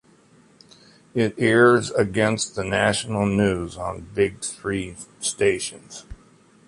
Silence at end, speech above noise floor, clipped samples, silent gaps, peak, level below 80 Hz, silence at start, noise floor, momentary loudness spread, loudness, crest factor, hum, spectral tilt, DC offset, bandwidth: 0.5 s; 33 dB; under 0.1%; none; -4 dBFS; -48 dBFS; 1.15 s; -55 dBFS; 15 LU; -22 LUFS; 20 dB; none; -4.5 dB/octave; under 0.1%; 11.5 kHz